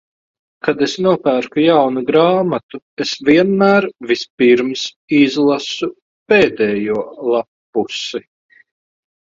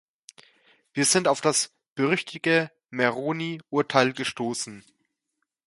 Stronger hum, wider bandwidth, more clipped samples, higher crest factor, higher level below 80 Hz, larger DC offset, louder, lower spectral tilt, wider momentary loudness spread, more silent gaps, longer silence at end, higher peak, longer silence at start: neither; second, 7.8 kHz vs 12 kHz; neither; second, 16 dB vs 24 dB; first, -58 dBFS vs -72 dBFS; neither; first, -15 LUFS vs -25 LUFS; first, -5.5 dB/octave vs -3 dB/octave; about the same, 11 LU vs 11 LU; first, 2.63-2.69 s, 2.82-2.97 s, 4.30-4.38 s, 4.96-5.08 s, 6.02-6.26 s, 7.48-7.73 s vs 1.90-1.96 s; first, 1.1 s vs 0.85 s; first, 0 dBFS vs -4 dBFS; second, 0.65 s vs 0.95 s